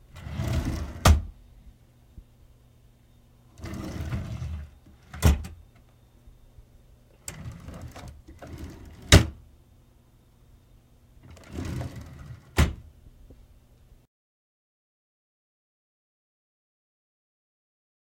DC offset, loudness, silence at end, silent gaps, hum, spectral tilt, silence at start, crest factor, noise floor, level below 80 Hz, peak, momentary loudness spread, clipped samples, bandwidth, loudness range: under 0.1%; -26 LUFS; 4.75 s; none; none; -4.5 dB/octave; 0.15 s; 30 dB; -58 dBFS; -36 dBFS; 0 dBFS; 24 LU; under 0.1%; 16.5 kHz; 13 LU